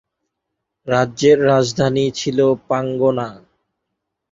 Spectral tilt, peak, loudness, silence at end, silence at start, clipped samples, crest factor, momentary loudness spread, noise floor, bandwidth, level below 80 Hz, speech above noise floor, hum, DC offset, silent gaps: -5.5 dB/octave; -2 dBFS; -17 LUFS; 0.95 s; 0.85 s; under 0.1%; 16 dB; 9 LU; -78 dBFS; 7.8 kHz; -54 dBFS; 62 dB; none; under 0.1%; none